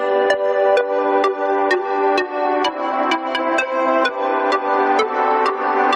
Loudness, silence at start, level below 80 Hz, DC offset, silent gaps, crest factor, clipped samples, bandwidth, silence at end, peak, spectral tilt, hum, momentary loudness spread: -18 LUFS; 0 s; -68 dBFS; under 0.1%; none; 14 dB; under 0.1%; 10.5 kHz; 0 s; -4 dBFS; -2.5 dB/octave; none; 3 LU